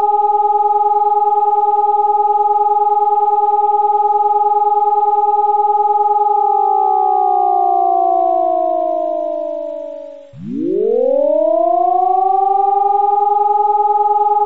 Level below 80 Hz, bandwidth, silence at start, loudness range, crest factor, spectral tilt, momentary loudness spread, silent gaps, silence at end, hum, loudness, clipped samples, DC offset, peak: -68 dBFS; 3.9 kHz; 0 s; 4 LU; 8 dB; -6.5 dB/octave; 6 LU; none; 0 s; none; -14 LUFS; under 0.1%; 1%; -6 dBFS